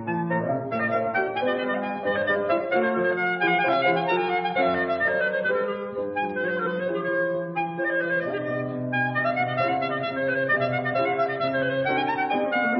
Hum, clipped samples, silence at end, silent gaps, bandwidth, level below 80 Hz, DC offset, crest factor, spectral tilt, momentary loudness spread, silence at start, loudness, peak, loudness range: none; under 0.1%; 0 s; none; 5.8 kHz; -62 dBFS; under 0.1%; 16 dB; -10 dB/octave; 5 LU; 0 s; -24 LUFS; -10 dBFS; 3 LU